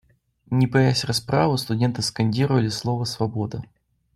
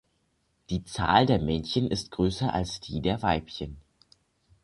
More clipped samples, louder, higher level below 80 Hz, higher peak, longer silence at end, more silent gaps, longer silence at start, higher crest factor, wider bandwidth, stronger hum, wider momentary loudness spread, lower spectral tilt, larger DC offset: neither; first, -22 LUFS vs -27 LUFS; second, -54 dBFS vs -44 dBFS; about the same, -6 dBFS vs -6 dBFS; second, 0.5 s vs 0.85 s; neither; second, 0.5 s vs 0.7 s; second, 16 dB vs 22 dB; first, 13.5 kHz vs 11.5 kHz; neither; second, 7 LU vs 12 LU; about the same, -5.5 dB/octave vs -6 dB/octave; neither